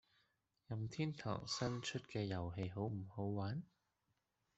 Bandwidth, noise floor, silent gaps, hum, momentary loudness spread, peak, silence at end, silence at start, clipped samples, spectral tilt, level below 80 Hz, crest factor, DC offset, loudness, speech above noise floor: 8.2 kHz; -86 dBFS; none; none; 5 LU; -26 dBFS; 0.95 s; 0.7 s; under 0.1%; -5.5 dB/octave; -72 dBFS; 18 dB; under 0.1%; -44 LUFS; 42 dB